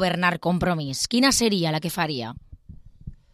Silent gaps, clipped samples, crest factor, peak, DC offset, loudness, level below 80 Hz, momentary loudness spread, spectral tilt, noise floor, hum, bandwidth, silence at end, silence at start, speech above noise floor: none; under 0.1%; 18 dB; -6 dBFS; under 0.1%; -22 LUFS; -48 dBFS; 8 LU; -4 dB/octave; -45 dBFS; none; 15 kHz; 0.2 s; 0 s; 22 dB